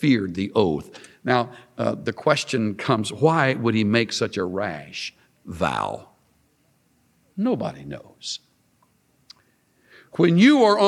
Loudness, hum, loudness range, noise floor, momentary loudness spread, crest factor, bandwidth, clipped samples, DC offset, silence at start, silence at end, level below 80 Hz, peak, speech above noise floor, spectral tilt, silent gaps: -22 LUFS; none; 10 LU; -64 dBFS; 16 LU; 20 dB; 12.5 kHz; under 0.1%; under 0.1%; 0 s; 0 s; -58 dBFS; -2 dBFS; 43 dB; -5.5 dB/octave; none